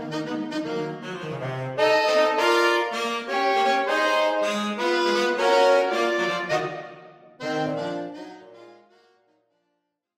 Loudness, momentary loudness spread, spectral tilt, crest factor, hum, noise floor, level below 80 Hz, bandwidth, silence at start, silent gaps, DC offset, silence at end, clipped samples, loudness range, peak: -23 LUFS; 13 LU; -4 dB/octave; 16 dB; none; -77 dBFS; -72 dBFS; 16 kHz; 0 s; none; under 0.1%; 1.45 s; under 0.1%; 10 LU; -8 dBFS